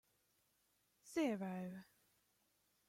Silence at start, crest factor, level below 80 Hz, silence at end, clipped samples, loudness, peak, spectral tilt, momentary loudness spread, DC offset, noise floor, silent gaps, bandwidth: 1.05 s; 20 dB; -88 dBFS; 1.05 s; under 0.1%; -44 LUFS; -28 dBFS; -6 dB/octave; 12 LU; under 0.1%; -81 dBFS; none; 16.5 kHz